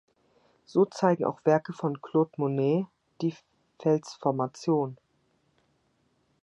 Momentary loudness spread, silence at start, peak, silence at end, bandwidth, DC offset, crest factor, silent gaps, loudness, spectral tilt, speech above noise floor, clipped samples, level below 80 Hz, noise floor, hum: 8 LU; 0.75 s; -8 dBFS; 1.5 s; 8.8 kHz; under 0.1%; 20 dB; none; -28 LUFS; -7.5 dB/octave; 44 dB; under 0.1%; -76 dBFS; -71 dBFS; none